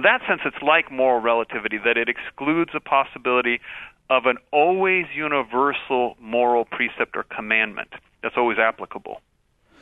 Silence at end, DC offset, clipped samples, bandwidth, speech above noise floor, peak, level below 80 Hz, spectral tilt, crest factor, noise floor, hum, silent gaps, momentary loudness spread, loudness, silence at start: 0.65 s; under 0.1%; under 0.1%; 4 kHz; 39 dB; -2 dBFS; -60 dBFS; -6.5 dB/octave; 20 dB; -60 dBFS; none; none; 12 LU; -21 LUFS; 0 s